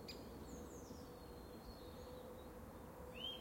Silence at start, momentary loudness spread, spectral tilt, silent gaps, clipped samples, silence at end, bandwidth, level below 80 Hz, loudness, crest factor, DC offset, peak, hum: 0 s; 5 LU; -4.5 dB/octave; none; under 0.1%; 0 s; 16.5 kHz; -62 dBFS; -54 LUFS; 16 dB; under 0.1%; -36 dBFS; none